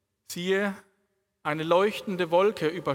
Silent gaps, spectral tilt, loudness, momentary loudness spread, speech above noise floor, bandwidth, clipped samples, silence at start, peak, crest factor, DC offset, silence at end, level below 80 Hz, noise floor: none; -5 dB/octave; -26 LUFS; 12 LU; 49 dB; 17.5 kHz; under 0.1%; 0.3 s; -10 dBFS; 18 dB; under 0.1%; 0 s; -72 dBFS; -75 dBFS